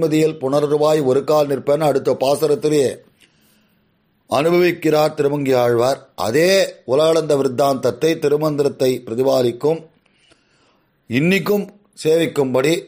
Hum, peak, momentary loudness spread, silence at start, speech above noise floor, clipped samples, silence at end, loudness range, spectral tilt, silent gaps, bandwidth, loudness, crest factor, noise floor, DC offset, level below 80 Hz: none; -4 dBFS; 6 LU; 0 s; 45 dB; under 0.1%; 0 s; 4 LU; -5.5 dB/octave; none; 15.5 kHz; -17 LUFS; 14 dB; -62 dBFS; under 0.1%; -60 dBFS